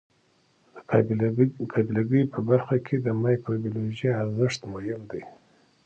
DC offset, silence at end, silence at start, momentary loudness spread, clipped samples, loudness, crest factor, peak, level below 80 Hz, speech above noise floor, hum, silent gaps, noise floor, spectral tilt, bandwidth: under 0.1%; 0.5 s; 0.75 s; 10 LU; under 0.1%; -26 LUFS; 20 dB; -6 dBFS; -62 dBFS; 40 dB; none; none; -65 dBFS; -8 dB/octave; 8.2 kHz